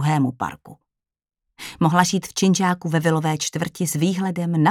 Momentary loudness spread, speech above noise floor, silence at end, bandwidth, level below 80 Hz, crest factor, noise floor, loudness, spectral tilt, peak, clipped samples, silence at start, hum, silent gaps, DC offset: 9 LU; 67 dB; 0 s; 16.5 kHz; -60 dBFS; 20 dB; -88 dBFS; -21 LUFS; -5 dB/octave; -2 dBFS; under 0.1%; 0 s; none; none; under 0.1%